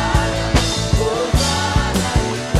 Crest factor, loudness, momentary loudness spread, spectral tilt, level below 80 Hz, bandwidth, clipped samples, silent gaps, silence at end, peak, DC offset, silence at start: 14 dB; -18 LUFS; 1 LU; -4.5 dB/octave; -24 dBFS; 14.5 kHz; under 0.1%; none; 0 s; -2 dBFS; under 0.1%; 0 s